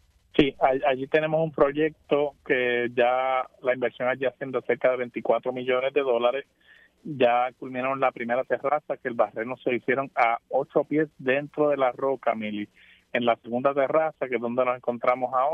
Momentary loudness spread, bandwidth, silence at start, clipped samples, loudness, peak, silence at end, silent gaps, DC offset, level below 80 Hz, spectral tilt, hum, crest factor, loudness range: 6 LU; 5.8 kHz; 0.35 s; under 0.1%; -25 LUFS; -4 dBFS; 0 s; none; under 0.1%; -60 dBFS; -7.5 dB/octave; none; 22 dB; 2 LU